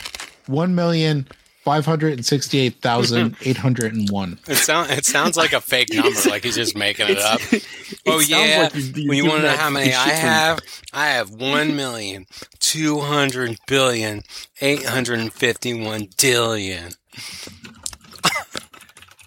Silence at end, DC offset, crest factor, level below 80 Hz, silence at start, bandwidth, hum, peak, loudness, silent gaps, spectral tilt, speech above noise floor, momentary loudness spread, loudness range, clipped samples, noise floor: 0.65 s; under 0.1%; 18 dB; -56 dBFS; 0 s; 17 kHz; none; -2 dBFS; -18 LUFS; none; -3.5 dB/octave; 26 dB; 16 LU; 4 LU; under 0.1%; -46 dBFS